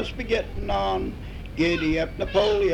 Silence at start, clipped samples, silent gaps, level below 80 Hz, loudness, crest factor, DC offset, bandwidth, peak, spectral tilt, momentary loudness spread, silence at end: 0 s; under 0.1%; none; -36 dBFS; -25 LUFS; 16 dB; under 0.1%; 12.5 kHz; -10 dBFS; -6 dB/octave; 10 LU; 0 s